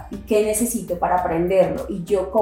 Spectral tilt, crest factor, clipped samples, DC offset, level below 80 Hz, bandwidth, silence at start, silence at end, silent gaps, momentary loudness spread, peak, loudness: -5 dB/octave; 16 dB; under 0.1%; under 0.1%; -42 dBFS; 17 kHz; 0 s; 0 s; none; 5 LU; -4 dBFS; -21 LUFS